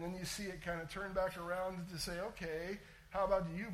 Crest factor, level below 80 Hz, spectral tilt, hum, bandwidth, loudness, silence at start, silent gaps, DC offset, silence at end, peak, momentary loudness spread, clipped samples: 18 dB; -58 dBFS; -4.5 dB/octave; none; 16 kHz; -41 LUFS; 0 s; none; under 0.1%; 0 s; -22 dBFS; 8 LU; under 0.1%